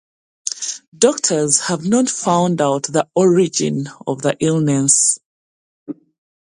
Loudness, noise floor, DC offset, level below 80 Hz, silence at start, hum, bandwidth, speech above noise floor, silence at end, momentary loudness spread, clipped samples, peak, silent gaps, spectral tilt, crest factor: -16 LUFS; under -90 dBFS; under 0.1%; -60 dBFS; 0.45 s; none; 11.5 kHz; over 74 dB; 0.55 s; 13 LU; under 0.1%; 0 dBFS; 0.87-0.92 s, 5.25-5.86 s; -4 dB/octave; 18 dB